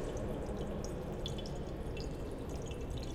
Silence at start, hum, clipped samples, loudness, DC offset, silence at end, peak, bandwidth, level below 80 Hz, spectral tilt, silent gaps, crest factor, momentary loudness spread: 0 s; none; under 0.1%; -42 LUFS; under 0.1%; 0 s; -26 dBFS; 16 kHz; -44 dBFS; -6 dB/octave; none; 14 dB; 2 LU